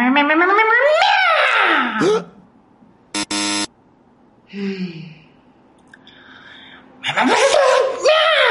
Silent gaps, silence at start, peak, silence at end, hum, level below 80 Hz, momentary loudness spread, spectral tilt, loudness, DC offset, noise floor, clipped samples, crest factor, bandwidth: none; 0 s; -2 dBFS; 0 s; none; -64 dBFS; 15 LU; -2.5 dB/octave; -15 LUFS; under 0.1%; -52 dBFS; under 0.1%; 14 dB; 11.5 kHz